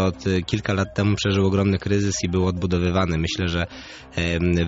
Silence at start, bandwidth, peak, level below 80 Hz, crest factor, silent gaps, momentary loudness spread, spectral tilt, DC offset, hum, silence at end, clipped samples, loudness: 0 s; 8 kHz; -8 dBFS; -40 dBFS; 14 dB; none; 6 LU; -5.5 dB/octave; under 0.1%; none; 0 s; under 0.1%; -22 LUFS